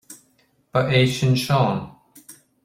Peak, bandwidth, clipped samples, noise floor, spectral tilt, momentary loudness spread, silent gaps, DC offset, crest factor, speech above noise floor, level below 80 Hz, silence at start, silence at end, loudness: -4 dBFS; 15.5 kHz; under 0.1%; -63 dBFS; -6 dB/octave; 10 LU; none; under 0.1%; 18 dB; 44 dB; -54 dBFS; 0.1 s; 0.3 s; -20 LUFS